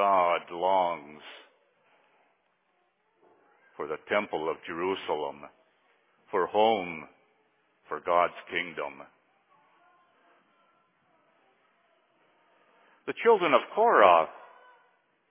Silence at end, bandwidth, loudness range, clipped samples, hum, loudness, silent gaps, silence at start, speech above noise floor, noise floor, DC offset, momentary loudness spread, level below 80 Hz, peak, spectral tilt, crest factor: 0.95 s; 3.9 kHz; 14 LU; under 0.1%; none; -27 LUFS; none; 0 s; 46 dB; -73 dBFS; under 0.1%; 19 LU; -74 dBFS; -4 dBFS; -7.5 dB/octave; 26 dB